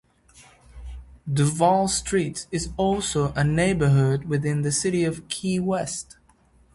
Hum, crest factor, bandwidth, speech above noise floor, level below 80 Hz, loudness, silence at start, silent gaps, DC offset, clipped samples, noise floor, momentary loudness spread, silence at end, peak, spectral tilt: none; 18 dB; 11.5 kHz; 36 dB; -44 dBFS; -23 LUFS; 0.4 s; none; under 0.1%; under 0.1%; -58 dBFS; 17 LU; 0.75 s; -6 dBFS; -5 dB/octave